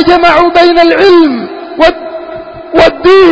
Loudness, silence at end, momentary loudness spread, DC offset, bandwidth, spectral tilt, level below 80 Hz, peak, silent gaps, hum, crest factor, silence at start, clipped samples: -6 LUFS; 0 s; 17 LU; under 0.1%; 8 kHz; -5 dB/octave; -34 dBFS; 0 dBFS; none; none; 6 dB; 0 s; 4%